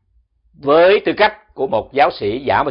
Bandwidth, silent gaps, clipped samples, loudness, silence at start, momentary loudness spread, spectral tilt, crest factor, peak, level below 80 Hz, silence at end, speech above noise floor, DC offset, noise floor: 5.4 kHz; none; under 0.1%; -15 LUFS; 0.65 s; 10 LU; -8 dB/octave; 16 dB; 0 dBFS; -48 dBFS; 0 s; 44 dB; under 0.1%; -59 dBFS